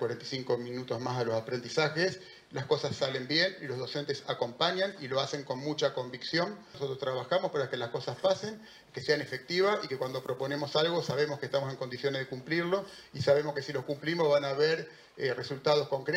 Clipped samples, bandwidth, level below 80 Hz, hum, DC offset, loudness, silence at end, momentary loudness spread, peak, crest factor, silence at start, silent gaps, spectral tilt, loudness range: under 0.1%; 16 kHz; -74 dBFS; none; under 0.1%; -32 LUFS; 0 s; 9 LU; -12 dBFS; 20 dB; 0 s; none; -5 dB/octave; 2 LU